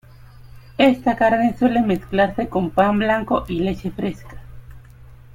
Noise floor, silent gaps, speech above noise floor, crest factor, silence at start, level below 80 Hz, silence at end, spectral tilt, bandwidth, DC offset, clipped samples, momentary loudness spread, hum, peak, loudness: -43 dBFS; none; 24 dB; 18 dB; 0.4 s; -42 dBFS; 0.2 s; -7.5 dB/octave; 16 kHz; under 0.1%; under 0.1%; 10 LU; none; -2 dBFS; -19 LUFS